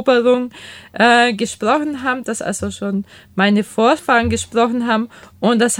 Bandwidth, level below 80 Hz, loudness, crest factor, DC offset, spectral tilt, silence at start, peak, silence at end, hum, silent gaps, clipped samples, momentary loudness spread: 16.5 kHz; -46 dBFS; -16 LUFS; 16 dB; under 0.1%; -4 dB/octave; 0 s; 0 dBFS; 0 s; none; none; under 0.1%; 11 LU